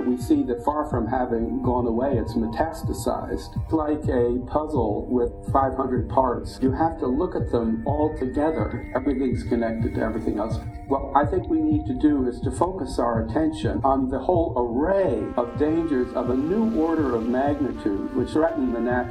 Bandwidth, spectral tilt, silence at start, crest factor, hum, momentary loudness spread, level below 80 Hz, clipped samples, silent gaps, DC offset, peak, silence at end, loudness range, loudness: 12.5 kHz; -8 dB/octave; 0 s; 20 dB; none; 5 LU; -38 dBFS; under 0.1%; none; under 0.1%; -4 dBFS; 0 s; 2 LU; -24 LUFS